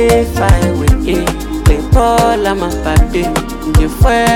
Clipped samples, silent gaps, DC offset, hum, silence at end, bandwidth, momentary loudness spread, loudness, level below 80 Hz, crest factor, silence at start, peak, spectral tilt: under 0.1%; none; under 0.1%; none; 0 s; 17 kHz; 5 LU; -13 LUFS; -16 dBFS; 10 dB; 0 s; 0 dBFS; -6 dB/octave